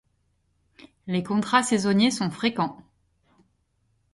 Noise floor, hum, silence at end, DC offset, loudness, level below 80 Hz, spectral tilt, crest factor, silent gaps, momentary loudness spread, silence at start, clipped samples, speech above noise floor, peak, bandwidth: -70 dBFS; none; 1.4 s; under 0.1%; -24 LUFS; -64 dBFS; -4.5 dB/octave; 20 dB; none; 9 LU; 1.05 s; under 0.1%; 46 dB; -6 dBFS; 11.5 kHz